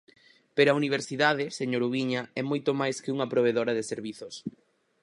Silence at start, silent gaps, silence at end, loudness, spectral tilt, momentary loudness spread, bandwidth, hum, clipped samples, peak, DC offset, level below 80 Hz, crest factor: 0.55 s; none; 0.55 s; -27 LUFS; -5 dB/octave; 14 LU; 11 kHz; none; under 0.1%; -8 dBFS; under 0.1%; -76 dBFS; 22 dB